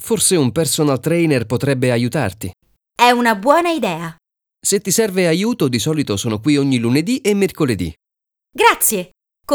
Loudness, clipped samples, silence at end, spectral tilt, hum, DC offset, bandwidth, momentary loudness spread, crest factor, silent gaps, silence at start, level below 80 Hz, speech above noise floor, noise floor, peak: -16 LUFS; under 0.1%; 0 s; -4.5 dB/octave; none; under 0.1%; over 20 kHz; 11 LU; 16 dB; none; 0 s; -50 dBFS; 68 dB; -84 dBFS; 0 dBFS